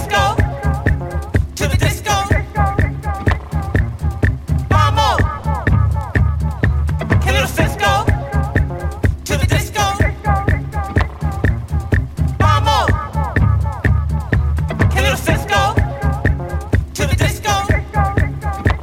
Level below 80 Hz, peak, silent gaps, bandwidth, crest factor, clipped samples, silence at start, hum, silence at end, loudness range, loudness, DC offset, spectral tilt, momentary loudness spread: -22 dBFS; 0 dBFS; none; 16.5 kHz; 14 dB; under 0.1%; 0 s; none; 0 s; 2 LU; -17 LUFS; under 0.1%; -5.5 dB/octave; 5 LU